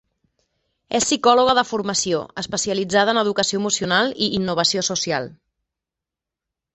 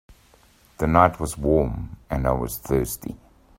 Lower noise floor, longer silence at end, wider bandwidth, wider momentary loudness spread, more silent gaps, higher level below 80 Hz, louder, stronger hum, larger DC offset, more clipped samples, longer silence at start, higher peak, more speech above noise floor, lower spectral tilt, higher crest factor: first, -86 dBFS vs -56 dBFS; first, 1.4 s vs 0.45 s; second, 8.6 kHz vs 16 kHz; second, 9 LU vs 16 LU; neither; second, -56 dBFS vs -36 dBFS; first, -19 LUFS vs -23 LUFS; neither; neither; neither; first, 0.9 s vs 0.1 s; about the same, -2 dBFS vs 0 dBFS; first, 67 dB vs 33 dB; second, -2.5 dB/octave vs -6.5 dB/octave; about the same, 20 dB vs 24 dB